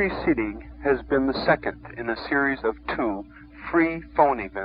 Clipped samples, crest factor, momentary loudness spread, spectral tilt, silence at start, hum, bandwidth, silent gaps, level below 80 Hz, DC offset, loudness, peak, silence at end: under 0.1%; 20 dB; 10 LU; -10 dB/octave; 0 s; none; 5.2 kHz; none; -44 dBFS; under 0.1%; -24 LUFS; -4 dBFS; 0 s